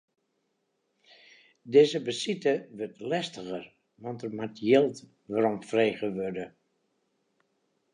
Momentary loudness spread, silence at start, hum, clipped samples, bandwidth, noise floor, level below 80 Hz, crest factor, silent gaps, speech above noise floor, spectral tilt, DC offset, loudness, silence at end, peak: 17 LU; 1.65 s; none; under 0.1%; 10.5 kHz; -77 dBFS; -74 dBFS; 22 dB; none; 49 dB; -5.5 dB/octave; under 0.1%; -28 LUFS; 1.45 s; -8 dBFS